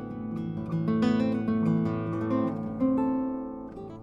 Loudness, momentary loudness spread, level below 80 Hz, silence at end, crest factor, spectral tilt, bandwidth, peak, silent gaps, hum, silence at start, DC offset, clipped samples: -28 LUFS; 10 LU; -56 dBFS; 0 s; 14 dB; -9 dB/octave; 7.4 kHz; -14 dBFS; none; none; 0 s; under 0.1%; under 0.1%